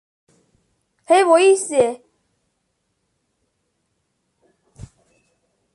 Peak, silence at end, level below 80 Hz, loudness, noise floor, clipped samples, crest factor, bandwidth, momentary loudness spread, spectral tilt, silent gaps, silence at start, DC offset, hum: -4 dBFS; 3.8 s; -60 dBFS; -16 LUFS; -72 dBFS; under 0.1%; 20 dB; 11.5 kHz; 9 LU; -3 dB/octave; none; 1.1 s; under 0.1%; none